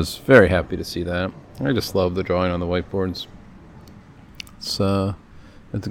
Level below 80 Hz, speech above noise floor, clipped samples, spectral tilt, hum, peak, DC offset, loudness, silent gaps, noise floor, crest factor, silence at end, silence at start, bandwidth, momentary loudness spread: -46 dBFS; 24 dB; under 0.1%; -6 dB/octave; none; 0 dBFS; under 0.1%; -21 LUFS; none; -44 dBFS; 22 dB; 0 s; 0 s; 17 kHz; 19 LU